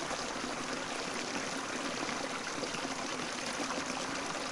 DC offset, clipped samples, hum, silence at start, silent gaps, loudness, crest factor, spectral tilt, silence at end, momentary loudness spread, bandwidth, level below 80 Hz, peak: under 0.1%; under 0.1%; none; 0 s; none; -36 LUFS; 16 dB; -2 dB/octave; 0 s; 1 LU; 11.5 kHz; -64 dBFS; -22 dBFS